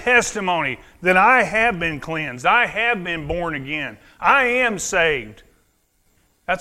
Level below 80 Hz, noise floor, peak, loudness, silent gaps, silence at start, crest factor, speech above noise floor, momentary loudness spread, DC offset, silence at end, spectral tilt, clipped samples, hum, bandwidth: -46 dBFS; -63 dBFS; 0 dBFS; -18 LUFS; none; 0 s; 20 dB; 44 dB; 11 LU; under 0.1%; 0 s; -3.5 dB/octave; under 0.1%; none; 15.5 kHz